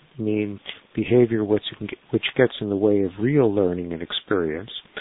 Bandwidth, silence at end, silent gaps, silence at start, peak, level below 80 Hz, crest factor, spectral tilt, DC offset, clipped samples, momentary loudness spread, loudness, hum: 4.1 kHz; 0 s; none; 0.15 s; -2 dBFS; -52 dBFS; 20 dB; -11.5 dB/octave; under 0.1%; under 0.1%; 13 LU; -23 LUFS; none